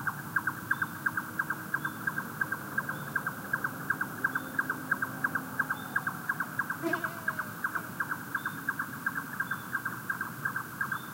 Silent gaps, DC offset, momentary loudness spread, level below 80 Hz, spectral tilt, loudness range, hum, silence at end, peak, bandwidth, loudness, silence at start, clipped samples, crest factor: none; under 0.1%; 3 LU; -70 dBFS; -4 dB/octave; 2 LU; none; 0 s; -16 dBFS; 16 kHz; -33 LUFS; 0 s; under 0.1%; 20 dB